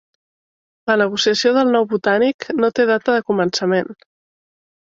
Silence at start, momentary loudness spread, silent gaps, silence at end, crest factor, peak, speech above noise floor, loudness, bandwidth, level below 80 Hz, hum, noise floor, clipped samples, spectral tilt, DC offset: 0.85 s; 5 LU; 2.34-2.39 s; 0.9 s; 16 dB; -2 dBFS; over 73 dB; -17 LUFS; 7.8 kHz; -62 dBFS; none; under -90 dBFS; under 0.1%; -4.5 dB/octave; under 0.1%